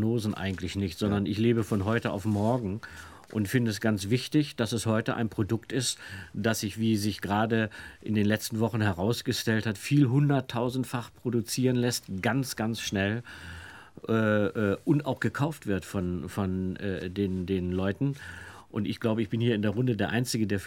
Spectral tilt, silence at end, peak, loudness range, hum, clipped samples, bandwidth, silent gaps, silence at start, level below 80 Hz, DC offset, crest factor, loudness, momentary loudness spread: -5.5 dB/octave; 0 s; -10 dBFS; 3 LU; none; under 0.1%; 18 kHz; none; 0 s; -58 dBFS; under 0.1%; 18 dB; -29 LUFS; 8 LU